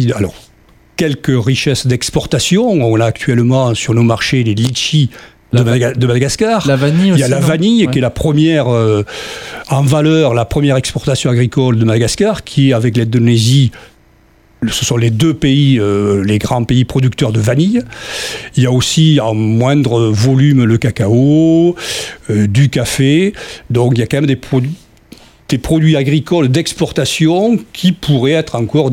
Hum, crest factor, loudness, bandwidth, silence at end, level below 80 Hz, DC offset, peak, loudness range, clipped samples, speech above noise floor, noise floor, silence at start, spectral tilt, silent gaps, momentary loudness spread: none; 12 dB; -12 LUFS; 16 kHz; 0 s; -38 dBFS; under 0.1%; 0 dBFS; 2 LU; under 0.1%; 36 dB; -47 dBFS; 0 s; -6 dB/octave; none; 7 LU